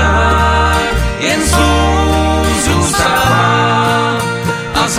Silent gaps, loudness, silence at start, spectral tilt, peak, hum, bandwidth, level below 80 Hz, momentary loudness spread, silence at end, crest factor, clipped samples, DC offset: none; -12 LUFS; 0 s; -4 dB/octave; 0 dBFS; none; 16 kHz; -20 dBFS; 5 LU; 0 s; 10 dB; under 0.1%; under 0.1%